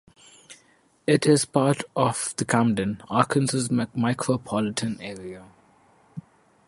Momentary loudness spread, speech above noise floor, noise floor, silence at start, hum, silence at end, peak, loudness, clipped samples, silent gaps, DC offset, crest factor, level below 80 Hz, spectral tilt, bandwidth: 20 LU; 37 dB; -61 dBFS; 0.5 s; none; 0.5 s; -4 dBFS; -24 LUFS; under 0.1%; none; under 0.1%; 22 dB; -60 dBFS; -5 dB/octave; 11.5 kHz